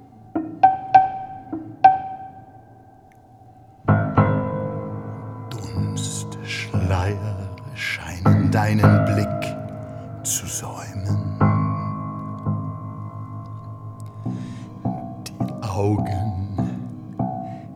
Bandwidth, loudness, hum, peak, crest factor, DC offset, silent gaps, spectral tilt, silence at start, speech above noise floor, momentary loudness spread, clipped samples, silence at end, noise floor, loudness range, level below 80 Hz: 16 kHz; -23 LUFS; none; 0 dBFS; 22 dB; under 0.1%; none; -6 dB/octave; 0 s; 32 dB; 17 LU; under 0.1%; 0 s; -49 dBFS; 8 LU; -52 dBFS